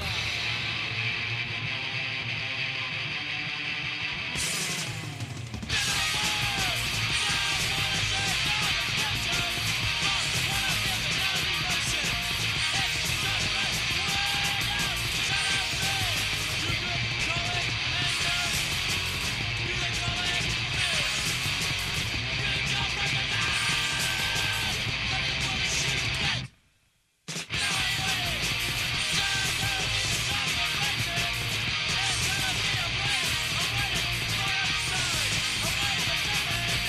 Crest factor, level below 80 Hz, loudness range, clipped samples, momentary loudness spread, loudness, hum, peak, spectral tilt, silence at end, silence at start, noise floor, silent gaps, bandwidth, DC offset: 16 dB; -44 dBFS; 3 LU; under 0.1%; 4 LU; -26 LUFS; none; -12 dBFS; -2 dB/octave; 0 s; 0 s; -69 dBFS; none; 13 kHz; under 0.1%